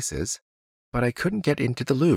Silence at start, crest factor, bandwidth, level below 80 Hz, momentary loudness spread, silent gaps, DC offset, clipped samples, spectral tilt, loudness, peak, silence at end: 0 s; 16 dB; 16 kHz; -46 dBFS; 8 LU; 0.42-0.92 s; under 0.1%; under 0.1%; -5.5 dB/octave; -26 LUFS; -8 dBFS; 0 s